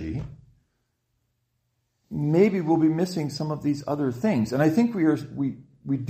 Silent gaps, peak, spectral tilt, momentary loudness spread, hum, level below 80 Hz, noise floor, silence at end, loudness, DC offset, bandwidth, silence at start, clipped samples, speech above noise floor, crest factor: none; -8 dBFS; -7.5 dB/octave; 12 LU; none; -54 dBFS; -74 dBFS; 0 s; -24 LUFS; under 0.1%; 15 kHz; 0 s; under 0.1%; 51 dB; 18 dB